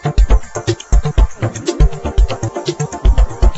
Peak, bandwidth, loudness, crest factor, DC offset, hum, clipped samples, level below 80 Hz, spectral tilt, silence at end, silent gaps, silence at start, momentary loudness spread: 0 dBFS; 8.2 kHz; -17 LUFS; 12 dB; under 0.1%; none; under 0.1%; -14 dBFS; -6 dB/octave; 0 s; none; 0 s; 6 LU